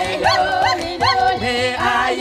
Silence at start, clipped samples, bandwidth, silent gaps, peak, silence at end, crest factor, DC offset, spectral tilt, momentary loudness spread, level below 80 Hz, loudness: 0 s; under 0.1%; 14.5 kHz; none; -4 dBFS; 0 s; 14 dB; under 0.1%; -3.5 dB/octave; 3 LU; -42 dBFS; -17 LUFS